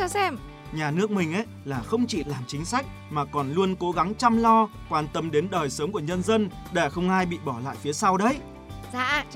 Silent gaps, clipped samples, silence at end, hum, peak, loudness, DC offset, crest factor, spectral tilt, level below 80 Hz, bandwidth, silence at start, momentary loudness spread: none; under 0.1%; 0 s; none; -6 dBFS; -26 LUFS; under 0.1%; 18 dB; -5 dB/octave; -48 dBFS; 16 kHz; 0 s; 10 LU